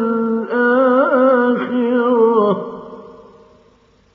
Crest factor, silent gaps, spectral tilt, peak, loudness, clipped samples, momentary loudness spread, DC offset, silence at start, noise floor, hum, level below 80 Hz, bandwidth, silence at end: 14 dB; none; -5 dB/octave; -2 dBFS; -15 LUFS; under 0.1%; 12 LU; under 0.1%; 0 s; -53 dBFS; none; -62 dBFS; 4.7 kHz; 1 s